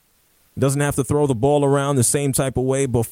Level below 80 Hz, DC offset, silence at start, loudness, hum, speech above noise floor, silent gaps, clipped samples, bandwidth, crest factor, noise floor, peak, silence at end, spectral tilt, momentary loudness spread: -44 dBFS; under 0.1%; 0.55 s; -19 LUFS; none; 41 dB; none; under 0.1%; 16.5 kHz; 14 dB; -59 dBFS; -6 dBFS; 0 s; -5.5 dB/octave; 4 LU